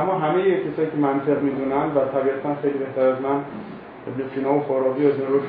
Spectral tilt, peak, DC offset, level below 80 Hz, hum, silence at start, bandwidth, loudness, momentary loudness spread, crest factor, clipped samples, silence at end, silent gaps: -11.5 dB/octave; -6 dBFS; under 0.1%; -60 dBFS; none; 0 s; 4.8 kHz; -22 LUFS; 11 LU; 14 dB; under 0.1%; 0 s; none